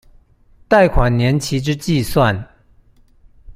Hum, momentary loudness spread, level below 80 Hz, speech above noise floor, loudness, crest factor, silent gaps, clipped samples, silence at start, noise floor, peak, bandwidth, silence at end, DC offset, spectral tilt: none; 7 LU; -28 dBFS; 35 dB; -16 LUFS; 16 dB; none; under 0.1%; 0.7 s; -50 dBFS; -2 dBFS; 15.5 kHz; 0.05 s; under 0.1%; -6 dB/octave